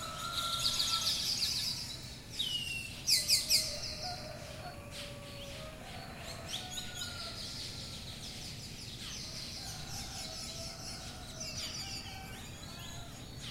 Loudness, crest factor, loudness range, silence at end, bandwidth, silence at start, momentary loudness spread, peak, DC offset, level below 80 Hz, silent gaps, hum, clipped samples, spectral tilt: -36 LUFS; 24 dB; 11 LU; 0 s; 16 kHz; 0 s; 16 LU; -14 dBFS; under 0.1%; -54 dBFS; none; none; under 0.1%; -1.5 dB/octave